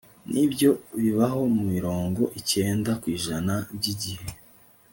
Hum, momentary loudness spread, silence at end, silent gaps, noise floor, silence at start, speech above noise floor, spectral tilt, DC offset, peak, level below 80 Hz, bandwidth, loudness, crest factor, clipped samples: none; 8 LU; 0.6 s; none; -55 dBFS; 0.25 s; 30 dB; -5.5 dB/octave; under 0.1%; -8 dBFS; -56 dBFS; 17 kHz; -25 LUFS; 16 dB; under 0.1%